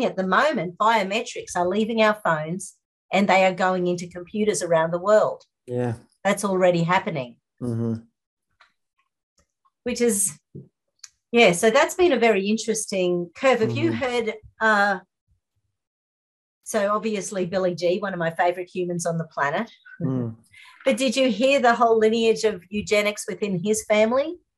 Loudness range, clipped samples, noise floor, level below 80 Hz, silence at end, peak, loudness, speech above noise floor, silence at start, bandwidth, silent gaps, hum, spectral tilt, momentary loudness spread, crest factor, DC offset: 6 LU; under 0.1%; -77 dBFS; -62 dBFS; 0.2 s; -4 dBFS; -22 LUFS; 55 dB; 0 s; 13 kHz; 2.85-3.09 s, 8.27-8.37 s, 9.23-9.36 s, 15.21-15.27 s, 15.87-16.61 s; none; -4.5 dB/octave; 12 LU; 18 dB; under 0.1%